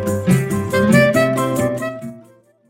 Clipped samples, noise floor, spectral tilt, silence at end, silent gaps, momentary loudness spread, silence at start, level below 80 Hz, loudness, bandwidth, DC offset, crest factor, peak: under 0.1%; -48 dBFS; -6 dB/octave; 0.5 s; none; 14 LU; 0 s; -48 dBFS; -16 LUFS; 16.5 kHz; under 0.1%; 16 dB; 0 dBFS